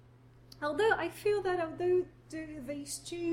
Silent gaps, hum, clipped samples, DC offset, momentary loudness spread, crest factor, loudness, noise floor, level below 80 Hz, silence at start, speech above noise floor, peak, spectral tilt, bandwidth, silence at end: none; none; under 0.1%; under 0.1%; 13 LU; 18 dB; -33 LUFS; -58 dBFS; -62 dBFS; 0.55 s; 25 dB; -16 dBFS; -4.5 dB/octave; 16.5 kHz; 0 s